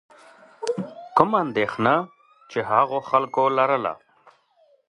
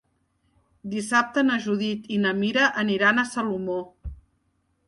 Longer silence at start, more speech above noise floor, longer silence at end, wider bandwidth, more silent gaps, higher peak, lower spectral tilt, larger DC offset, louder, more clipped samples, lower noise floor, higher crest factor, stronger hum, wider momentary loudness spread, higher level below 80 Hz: second, 0.6 s vs 0.85 s; second, 40 dB vs 47 dB; first, 0.95 s vs 0.7 s; about the same, 11 kHz vs 11.5 kHz; neither; first, 0 dBFS vs -8 dBFS; first, -6 dB/octave vs -4.5 dB/octave; neither; about the same, -22 LUFS vs -23 LUFS; neither; second, -61 dBFS vs -70 dBFS; first, 24 dB vs 18 dB; neither; second, 11 LU vs 16 LU; second, -64 dBFS vs -50 dBFS